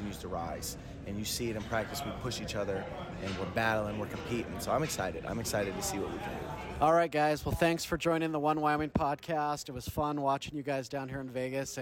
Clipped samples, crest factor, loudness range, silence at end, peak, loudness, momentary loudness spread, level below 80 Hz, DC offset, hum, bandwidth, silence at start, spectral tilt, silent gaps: under 0.1%; 18 dB; 5 LU; 0 s; -16 dBFS; -33 LUFS; 9 LU; -52 dBFS; under 0.1%; none; 18 kHz; 0 s; -4.5 dB/octave; none